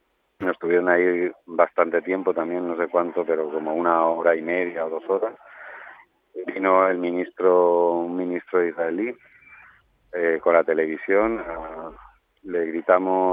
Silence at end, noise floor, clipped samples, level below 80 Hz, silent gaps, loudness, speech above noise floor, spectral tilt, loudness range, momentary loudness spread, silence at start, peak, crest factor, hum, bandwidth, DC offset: 0 s; -55 dBFS; under 0.1%; -60 dBFS; none; -22 LUFS; 33 dB; -9 dB/octave; 3 LU; 15 LU; 0.4 s; -4 dBFS; 20 dB; none; 3.8 kHz; under 0.1%